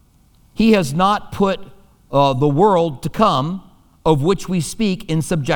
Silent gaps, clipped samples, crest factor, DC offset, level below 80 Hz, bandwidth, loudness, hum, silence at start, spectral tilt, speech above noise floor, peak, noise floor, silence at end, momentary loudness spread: none; under 0.1%; 16 dB; under 0.1%; -42 dBFS; 19 kHz; -17 LUFS; none; 0.6 s; -6 dB/octave; 36 dB; 0 dBFS; -52 dBFS; 0 s; 8 LU